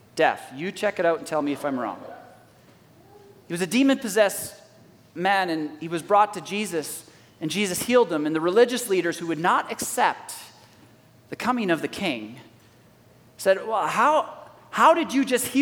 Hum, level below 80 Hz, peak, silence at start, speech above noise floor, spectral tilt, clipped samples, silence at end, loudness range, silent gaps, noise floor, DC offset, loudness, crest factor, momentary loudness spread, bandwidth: none; -68 dBFS; -6 dBFS; 0.15 s; 31 dB; -4 dB/octave; under 0.1%; 0 s; 5 LU; none; -54 dBFS; under 0.1%; -23 LUFS; 20 dB; 14 LU; 18.5 kHz